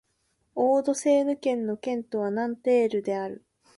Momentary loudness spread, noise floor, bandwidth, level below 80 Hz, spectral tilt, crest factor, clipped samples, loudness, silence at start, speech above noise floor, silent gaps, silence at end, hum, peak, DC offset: 9 LU; -73 dBFS; 11.5 kHz; -72 dBFS; -5 dB/octave; 14 dB; under 0.1%; -26 LUFS; 0.55 s; 47 dB; none; 0.4 s; none; -12 dBFS; under 0.1%